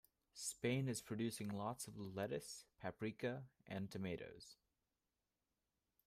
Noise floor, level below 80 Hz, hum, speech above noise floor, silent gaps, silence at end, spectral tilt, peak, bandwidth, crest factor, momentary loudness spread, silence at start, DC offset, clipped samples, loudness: under -90 dBFS; -78 dBFS; none; over 44 dB; none; 1.55 s; -5 dB/octave; -28 dBFS; 15.5 kHz; 20 dB; 12 LU; 0.35 s; under 0.1%; under 0.1%; -47 LUFS